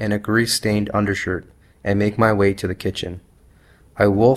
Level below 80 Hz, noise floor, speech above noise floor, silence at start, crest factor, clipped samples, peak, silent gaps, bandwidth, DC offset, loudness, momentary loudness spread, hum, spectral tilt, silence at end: -46 dBFS; -51 dBFS; 33 dB; 0 s; 18 dB; under 0.1%; -2 dBFS; none; 14.5 kHz; under 0.1%; -20 LUFS; 13 LU; none; -5.5 dB/octave; 0 s